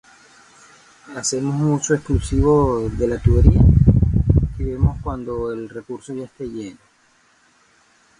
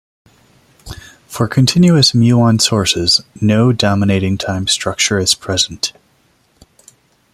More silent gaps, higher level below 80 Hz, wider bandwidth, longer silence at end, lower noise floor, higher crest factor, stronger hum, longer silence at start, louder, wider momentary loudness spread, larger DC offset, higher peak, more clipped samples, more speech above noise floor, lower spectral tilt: neither; first, -24 dBFS vs -46 dBFS; second, 11.5 kHz vs 14 kHz; about the same, 1.45 s vs 1.45 s; about the same, -57 dBFS vs -56 dBFS; about the same, 18 dB vs 14 dB; neither; first, 1.1 s vs 0.85 s; second, -18 LUFS vs -13 LUFS; first, 18 LU vs 12 LU; neither; about the same, 0 dBFS vs 0 dBFS; neither; about the same, 40 dB vs 43 dB; first, -7 dB/octave vs -4.5 dB/octave